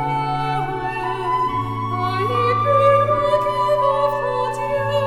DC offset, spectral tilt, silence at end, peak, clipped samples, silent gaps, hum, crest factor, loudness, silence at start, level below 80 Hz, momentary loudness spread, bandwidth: under 0.1%; -6.5 dB/octave; 0 s; -4 dBFS; under 0.1%; none; none; 14 dB; -19 LUFS; 0 s; -42 dBFS; 8 LU; 13 kHz